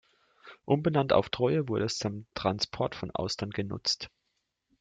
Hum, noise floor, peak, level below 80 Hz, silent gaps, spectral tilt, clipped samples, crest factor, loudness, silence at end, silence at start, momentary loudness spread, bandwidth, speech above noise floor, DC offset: none; -80 dBFS; -10 dBFS; -60 dBFS; none; -5 dB/octave; under 0.1%; 22 dB; -30 LUFS; 0.75 s; 0.45 s; 9 LU; 9.4 kHz; 51 dB; under 0.1%